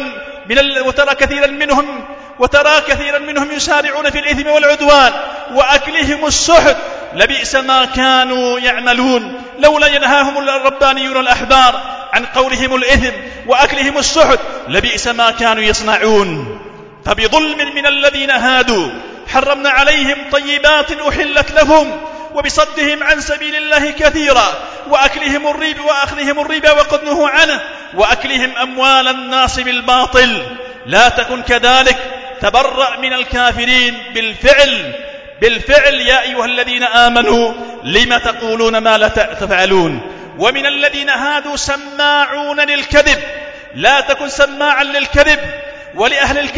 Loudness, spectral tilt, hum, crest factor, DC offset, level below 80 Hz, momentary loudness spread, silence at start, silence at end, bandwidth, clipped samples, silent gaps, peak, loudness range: -11 LUFS; -2.5 dB/octave; none; 12 dB; under 0.1%; -32 dBFS; 9 LU; 0 s; 0 s; 8 kHz; 0.4%; none; 0 dBFS; 2 LU